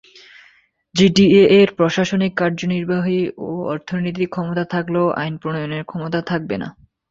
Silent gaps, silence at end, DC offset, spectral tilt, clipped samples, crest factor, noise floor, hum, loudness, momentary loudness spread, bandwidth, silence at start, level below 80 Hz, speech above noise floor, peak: none; 0.4 s; under 0.1%; -6 dB/octave; under 0.1%; 16 dB; -55 dBFS; none; -18 LUFS; 14 LU; 7.8 kHz; 0.95 s; -54 dBFS; 37 dB; -2 dBFS